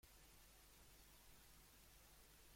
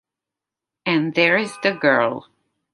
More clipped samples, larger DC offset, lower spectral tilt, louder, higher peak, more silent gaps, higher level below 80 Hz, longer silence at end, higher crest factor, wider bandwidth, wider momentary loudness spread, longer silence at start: neither; neither; second, -2.5 dB/octave vs -5.5 dB/octave; second, -67 LUFS vs -19 LUFS; second, -48 dBFS vs -2 dBFS; neither; about the same, -72 dBFS vs -70 dBFS; second, 0 s vs 0.5 s; about the same, 20 dB vs 20 dB; first, 16.5 kHz vs 11.5 kHz; second, 0 LU vs 9 LU; second, 0 s vs 0.85 s